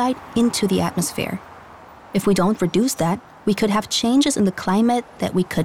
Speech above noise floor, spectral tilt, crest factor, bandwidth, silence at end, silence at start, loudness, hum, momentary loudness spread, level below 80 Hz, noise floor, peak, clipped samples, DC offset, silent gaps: 23 dB; -5 dB/octave; 12 dB; 16.5 kHz; 0 s; 0 s; -20 LUFS; none; 6 LU; -50 dBFS; -43 dBFS; -10 dBFS; under 0.1%; under 0.1%; none